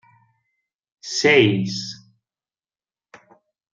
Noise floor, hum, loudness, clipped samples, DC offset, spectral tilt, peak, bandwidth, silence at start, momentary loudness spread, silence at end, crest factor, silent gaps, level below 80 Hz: under -90 dBFS; none; -18 LUFS; under 0.1%; under 0.1%; -4.5 dB/octave; -4 dBFS; 9.2 kHz; 1.05 s; 23 LU; 1.75 s; 20 dB; none; -66 dBFS